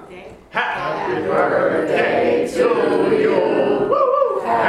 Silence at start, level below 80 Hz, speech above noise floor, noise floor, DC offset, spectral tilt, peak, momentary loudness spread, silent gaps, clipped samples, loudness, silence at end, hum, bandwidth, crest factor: 0 s; -54 dBFS; 21 dB; -38 dBFS; under 0.1%; -6 dB/octave; -2 dBFS; 6 LU; none; under 0.1%; -18 LUFS; 0 s; none; 12.5 kHz; 16 dB